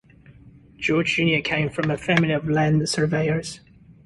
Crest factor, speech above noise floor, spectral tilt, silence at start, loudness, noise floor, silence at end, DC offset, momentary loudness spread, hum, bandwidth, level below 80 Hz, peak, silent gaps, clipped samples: 18 dB; 27 dB; -5.5 dB/octave; 0.45 s; -22 LUFS; -49 dBFS; 0.5 s; under 0.1%; 8 LU; none; 11.5 kHz; -52 dBFS; -6 dBFS; none; under 0.1%